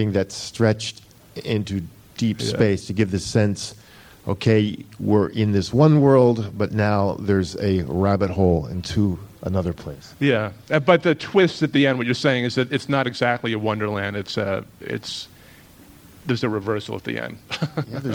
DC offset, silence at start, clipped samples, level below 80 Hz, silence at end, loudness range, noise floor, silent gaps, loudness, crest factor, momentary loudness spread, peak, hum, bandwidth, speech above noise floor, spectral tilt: under 0.1%; 0 s; under 0.1%; -48 dBFS; 0 s; 8 LU; -47 dBFS; none; -21 LUFS; 20 dB; 13 LU; -2 dBFS; none; 16.5 kHz; 26 dB; -6.5 dB/octave